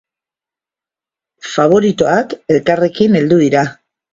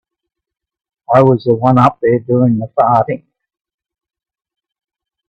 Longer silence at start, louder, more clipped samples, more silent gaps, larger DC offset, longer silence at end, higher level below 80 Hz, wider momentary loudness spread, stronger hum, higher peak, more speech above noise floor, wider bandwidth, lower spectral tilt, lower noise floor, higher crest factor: first, 1.45 s vs 1.1 s; about the same, -13 LUFS vs -12 LUFS; neither; neither; neither; second, 0.4 s vs 2.15 s; about the same, -52 dBFS vs -52 dBFS; first, 8 LU vs 5 LU; neither; about the same, 0 dBFS vs 0 dBFS; first, 77 dB vs 67 dB; first, 7.8 kHz vs 6.4 kHz; second, -6.5 dB/octave vs -10 dB/octave; first, -88 dBFS vs -79 dBFS; about the same, 14 dB vs 16 dB